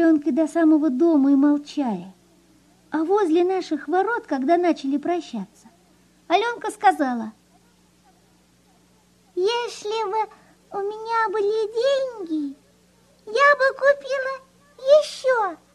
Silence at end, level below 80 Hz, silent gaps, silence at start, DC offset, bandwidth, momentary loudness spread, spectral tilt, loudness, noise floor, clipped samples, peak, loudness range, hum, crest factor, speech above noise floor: 0.2 s; -70 dBFS; none; 0 s; under 0.1%; 12 kHz; 13 LU; -4.5 dB/octave; -21 LUFS; -58 dBFS; under 0.1%; -4 dBFS; 7 LU; 60 Hz at -65 dBFS; 18 dB; 37 dB